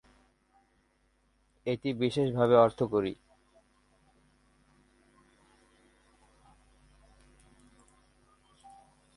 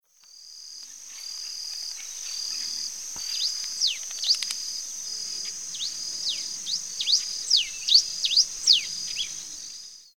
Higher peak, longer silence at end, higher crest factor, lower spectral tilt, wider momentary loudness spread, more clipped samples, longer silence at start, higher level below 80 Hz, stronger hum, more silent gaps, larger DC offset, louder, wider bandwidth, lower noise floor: about the same, -8 dBFS vs -6 dBFS; first, 6 s vs 0.05 s; about the same, 26 dB vs 24 dB; first, -7.5 dB/octave vs 3.5 dB/octave; second, 15 LU vs 18 LU; neither; first, 1.65 s vs 0.2 s; about the same, -66 dBFS vs -68 dBFS; neither; neither; second, under 0.1% vs 0.2%; second, -28 LUFS vs -25 LUFS; second, 11.5 kHz vs 19 kHz; first, -71 dBFS vs -51 dBFS